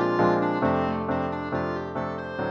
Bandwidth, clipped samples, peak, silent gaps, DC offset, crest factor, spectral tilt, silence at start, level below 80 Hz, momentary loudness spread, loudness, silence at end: 7 kHz; under 0.1%; -10 dBFS; none; under 0.1%; 16 dB; -8 dB/octave; 0 s; -52 dBFS; 9 LU; -26 LUFS; 0 s